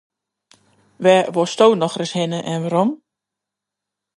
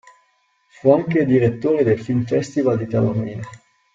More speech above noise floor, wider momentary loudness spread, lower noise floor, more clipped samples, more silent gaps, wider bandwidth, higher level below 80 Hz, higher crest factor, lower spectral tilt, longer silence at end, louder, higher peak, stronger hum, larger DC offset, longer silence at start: first, 67 dB vs 45 dB; about the same, 8 LU vs 10 LU; first, -84 dBFS vs -63 dBFS; neither; neither; first, 11.5 kHz vs 7.8 kHz; second, -70 dBFS vs -54 dBFS; about the same, 20 dB vs 18 dB; second, -5.5 dB/octave vs -8.5 dB/octave; first, 1.2 s vs 0.35 s; about the same, -18 LUFS vs -19 LUFS; about the same, 0 dBFS vs -2 dBFS; first, 50 Hz at -50 dBFS vs none; neither; first, 1 s vs 0.85 s